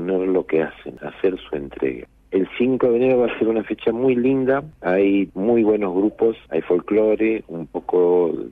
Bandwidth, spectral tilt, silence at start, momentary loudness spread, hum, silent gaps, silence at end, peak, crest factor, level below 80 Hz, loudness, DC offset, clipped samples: 3.9 kHz; -9.5 dB/octave; 0 s; 9 LU; none; none; 0 s; -8 dBFS; 12 dB; -52 dBFS; -20 LUFS; under 0.1%; under 0.1%